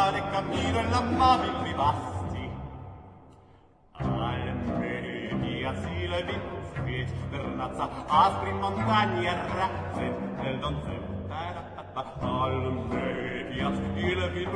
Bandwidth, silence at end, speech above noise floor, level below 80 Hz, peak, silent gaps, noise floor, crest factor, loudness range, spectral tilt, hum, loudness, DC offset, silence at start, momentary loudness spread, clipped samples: 10.5 kHz; 0 s; 29 dB; -46 dBFS; -10 dBFS; none; -57 dBFS; 20 dB; 5 LU; -6.5 dB/octave; none; -29 LUFS; under 0.1%; 0 s; 12 LU; under 0.1%